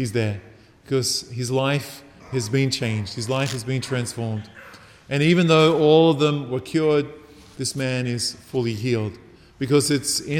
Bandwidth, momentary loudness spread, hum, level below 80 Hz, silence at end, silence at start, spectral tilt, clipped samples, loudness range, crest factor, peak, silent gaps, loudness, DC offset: 17.5 kHz; 14 LU; none; -58 dBFS; 0 s; 0 s; -5 dB/octave; under 0.1%; 6 LU; 18 dB; -4 dBFS; none; -22 LUFS; under 0.1%